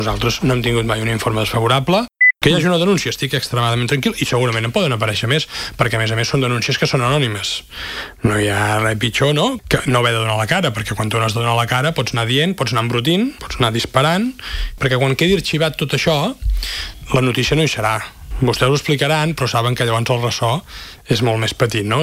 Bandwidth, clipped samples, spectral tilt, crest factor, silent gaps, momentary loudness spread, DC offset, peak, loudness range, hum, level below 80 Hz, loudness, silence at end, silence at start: 16 kHz; under 0.1%; -5 dB/octave; 16 dB; none; 6 LU; under 0.1%; 0 dBFS; 2 LU; none; -34 dBFS; -17 LUFS; 0 s; 0 s